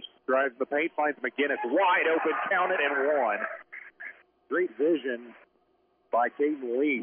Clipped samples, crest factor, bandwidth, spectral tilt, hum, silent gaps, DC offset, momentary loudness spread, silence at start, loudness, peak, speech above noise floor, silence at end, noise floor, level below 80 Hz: under 0.1%; 14 dB; 3.6 kHz; -7.5 dB/octave; none; none; under 0.1%; 15 LU; 0 s; -27 LUFS; -14 dBFS; 42 dB; 0 s; -69 dBFS; -86 dBFS